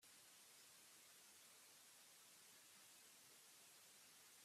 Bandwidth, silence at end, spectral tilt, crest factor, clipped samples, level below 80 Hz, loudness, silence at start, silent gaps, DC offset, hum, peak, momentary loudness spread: 15.5 kHz; 0 s; 0.5 dB/octave; 12 dB; under 0.1%; under -90 dBFS; -65 LUFS; 0 s; none; under 0.1%; none; -54 dBFS; 0 LU